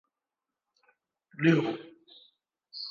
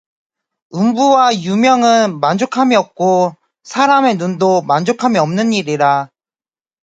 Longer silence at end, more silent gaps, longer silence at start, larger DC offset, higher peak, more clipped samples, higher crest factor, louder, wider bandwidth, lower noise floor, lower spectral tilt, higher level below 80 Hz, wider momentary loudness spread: second, 0 s vs 0.75 s; neither; first, 1.4 s vs 0.75 s; neither; second, -12 dBFS vs 0 dBFS; neither; first, 22 dB vs 14 dB; second, -28 LUFS vs -13 LUFS; second, 7 kHz vs 9.2 kHz; about the same, -89 dBFS vs under -90 dBFS; first, -7.5 dB/octave vs -5 dB/octave; second, -80 dBFS vs -62 dBFS; first, 25 LU vs 6 LU